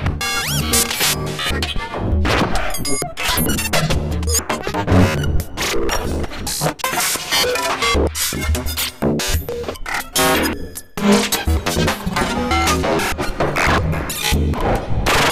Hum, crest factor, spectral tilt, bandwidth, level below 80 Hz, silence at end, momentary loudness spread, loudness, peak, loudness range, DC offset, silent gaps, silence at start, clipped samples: none; 16 dB; -3.5 dB/octave; 16 kHz; -26 dBFS; 0 s; 6 LU; -18 LUFS; -2 dBFS; 1 LU; under 0.1%; none; 0 s; under 0.1%